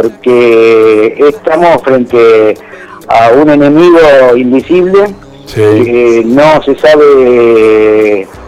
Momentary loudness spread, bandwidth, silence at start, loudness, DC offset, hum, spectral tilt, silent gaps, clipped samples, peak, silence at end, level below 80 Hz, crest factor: 5 LU; 12 kHz; 0 s; -5 LUFS; under 0.1%; none; -6.5 dB/octave; none; 3%; 0 dBFS; 0 s; -38 dBFS; 4 dB